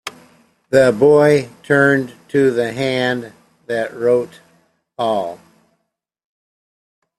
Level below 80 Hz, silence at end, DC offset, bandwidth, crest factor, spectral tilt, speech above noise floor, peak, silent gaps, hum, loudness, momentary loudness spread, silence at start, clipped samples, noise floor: -58 dBFS; 1.85 s; under 0.1%; 13 kHz; 16 dB; -6 dB/octave; 57 dB; -2 dBFS; none; none; -16 LUFS; 14 LU; 0.05 s; under 0.1%; -72 dBFS